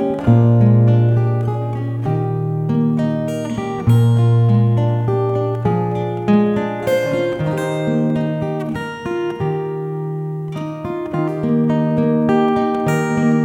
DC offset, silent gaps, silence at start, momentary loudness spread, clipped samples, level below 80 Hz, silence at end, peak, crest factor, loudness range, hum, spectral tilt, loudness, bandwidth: under 0.1%; none; 0 s; 10 LU; under 0.1%; -48 dBFS; 0 s; -2 dBFS; 16 dB; 5 LU; none; -8.5 dB/octave; -17 LUFS; 9.6 kHz